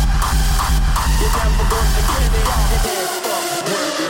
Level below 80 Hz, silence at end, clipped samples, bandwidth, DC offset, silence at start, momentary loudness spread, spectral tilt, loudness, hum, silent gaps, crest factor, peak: -18 dBFS; 0 s; under 0.1%; 17 kHz; under 0.1%; 0 s; 2 LU; -4 dB/octave; -18 LUFS; none; none; 10 dB; -4 dBFS